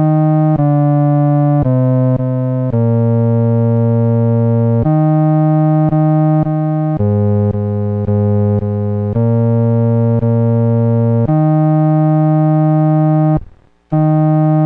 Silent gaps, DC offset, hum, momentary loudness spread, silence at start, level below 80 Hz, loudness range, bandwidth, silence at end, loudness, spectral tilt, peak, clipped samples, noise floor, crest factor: none; under 0.1%; none; 4 LU; 0 s; -40 dBFS; 2 LU; 2.8 kHz; 0 s; -13 LUFS; -13.5 dB/octave; -4 dBFS; under 0.1%; -39 dBFS; 8 dB